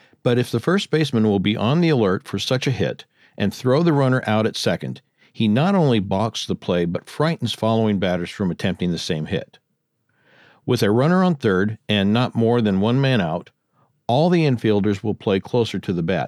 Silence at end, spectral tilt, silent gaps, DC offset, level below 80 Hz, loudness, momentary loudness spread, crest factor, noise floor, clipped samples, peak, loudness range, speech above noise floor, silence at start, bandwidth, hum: 0 s; -6.5 dB/octave; none; under 0.1%; -58 dBFS; -20 LUFS; 8 LU; 16 dB; -70 dBFS; under 0.1%; -4 dBFS; 4 LU; 51 dB; 0.25 s; 13.5 kHz; none